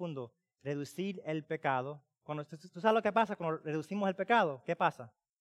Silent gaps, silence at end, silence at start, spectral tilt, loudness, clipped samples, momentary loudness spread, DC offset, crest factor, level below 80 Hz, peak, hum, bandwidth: none; 0.3 s; 0 s; -6.5 dB/octave; -34 LUFS; under 0.1%; 17 LU; under 0.1%; 20 dB; -82 dBFS; -14 dBFS; none; 13.5 kHz